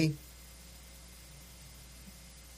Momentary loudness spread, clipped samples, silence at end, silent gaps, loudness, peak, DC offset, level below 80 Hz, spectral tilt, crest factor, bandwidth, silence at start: 6 LU; under 0.1%; 0 s; none; -46 LUFS; -16 dBFS; under 0.1%; -56 dBFS; -5.5 dB/octave; 24 dB; 15.5 kHz; 0 s